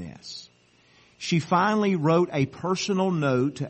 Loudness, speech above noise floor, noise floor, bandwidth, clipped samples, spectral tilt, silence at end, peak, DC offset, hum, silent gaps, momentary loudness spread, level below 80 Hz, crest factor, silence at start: -24 LUFS; 37 dB; -60 dBFS; 8.4 kHz; under 0.1%; -6 dB/octave; 0 s; -10 dBFS; under 0.1%; none; none; 16 LU; -64 dBFS; 16 dB; 0 s